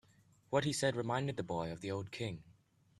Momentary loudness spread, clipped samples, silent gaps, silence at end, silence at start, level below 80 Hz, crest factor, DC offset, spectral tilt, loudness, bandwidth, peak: 8 LU; under 0.1%; none; 0.45 s; 0.5 s; -68 dBFS; 20 dB; under 0.1%; -5 dB/octave; -38 LUFS; 13 kHz; -18 dBFS